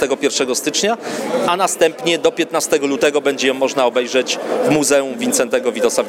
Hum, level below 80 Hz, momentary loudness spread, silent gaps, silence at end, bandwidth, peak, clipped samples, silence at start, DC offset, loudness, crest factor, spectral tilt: none; -58 dBFS; 3 LU; none; 0 s; 16.5 kHz; 0 dBFS; under 0.1%; 0 s; under 0.1%; -16 LUFS; 16 dB; -2.5 dB/octave